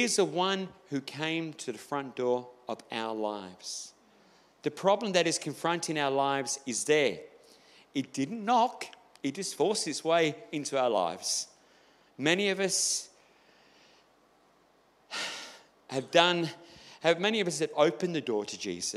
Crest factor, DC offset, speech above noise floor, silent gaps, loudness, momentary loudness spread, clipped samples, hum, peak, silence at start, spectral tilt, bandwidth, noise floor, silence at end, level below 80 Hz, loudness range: 26 dB; under 0.1%; 35 dB; none; -30 LUFS; 13 LU; under 0.1%; none; -4 dBFS; 0 s; -3 dB/octave; 15.5 kHz; -65 dBFS; 0 s; -80 dBFS; 6 LU